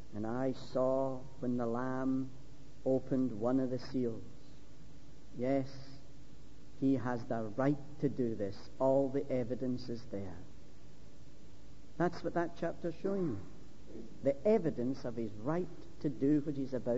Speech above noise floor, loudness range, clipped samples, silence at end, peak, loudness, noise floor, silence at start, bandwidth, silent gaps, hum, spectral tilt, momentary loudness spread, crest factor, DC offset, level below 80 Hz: 22 dB; 5 LU; under 0.1%; 0 s; -20 dBFS; -36 LUFS; -57 dBFS; 0 s; 7.6 kHz; none; none; -7.5 dB/octave; 17 LU; 18 dB; 0.9%; -62 dBFS